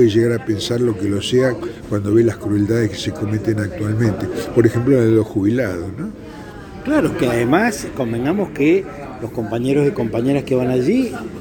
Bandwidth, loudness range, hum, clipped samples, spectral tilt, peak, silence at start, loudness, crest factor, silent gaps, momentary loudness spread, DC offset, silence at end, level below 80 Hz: 18.5 kHz; 1 LU; none; under 0.1%; -6.5 dB/octave; 0 dBFS; 0 s; -18 LUFS; 18 dB; none; 12 LU; under 0.1%; 0 s; -44 dBFS